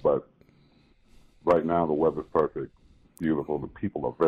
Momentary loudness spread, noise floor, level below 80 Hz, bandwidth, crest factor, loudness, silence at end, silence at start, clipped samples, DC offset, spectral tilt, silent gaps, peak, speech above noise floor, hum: 10 LU; -60 dBFS; -56 dBFS; 10 kHz; 16 dB; -28 LUFS; 0 s; 0.05 s; under 0.1%; under 0.1%; -9 dB/octave; none; -12 dBFS; 34 dB; none